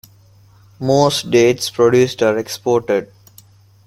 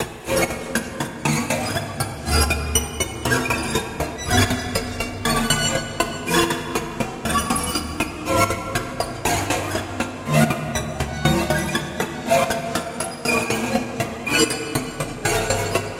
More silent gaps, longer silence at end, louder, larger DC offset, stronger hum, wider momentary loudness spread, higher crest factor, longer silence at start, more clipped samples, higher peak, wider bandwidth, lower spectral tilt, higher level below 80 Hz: neither; first, 0.8 s vs 0 s; first, -16 LUFS vs -22 LUFS; neither; neither; about the same, 7 LU vs 7 LU; about the same, 16 dB vs 20 dB; first, 0.8 s vs 0 s; neither; first, 0 dBFS vs -4 dBFS; about the same, 15.5 kHz vs 17 kHz; first, -5 dB/octave vs -3.5 dB/octave; second, -52 dBFS vs -36 dBFS